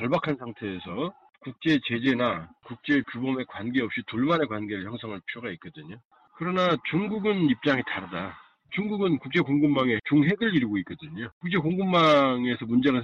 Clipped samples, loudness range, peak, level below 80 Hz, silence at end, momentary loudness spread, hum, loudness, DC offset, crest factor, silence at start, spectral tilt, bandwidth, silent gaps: under 0.1%; 5 LU; -10 dBFS; -62 dBFS; 0 s; 14 LU; none; -26 LUFS; under 0.1%; 16 dB; 0 s; -7.5 dB/octave; 7.2 kHz; 6.05-6.11 s, 11.32-11.41 s